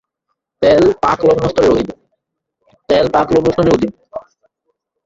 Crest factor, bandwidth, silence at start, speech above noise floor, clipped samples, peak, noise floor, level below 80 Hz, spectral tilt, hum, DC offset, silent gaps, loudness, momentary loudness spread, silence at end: 14 dB; 7.8 kHz; 0.6 s; 61 dB; under 0.1%; 0 dBFS; -73 dBFS; -40 dBFS; -6.5 dB/octave; none; under 0.1%; none; -13 LUFS; 14 LU; 0.85 s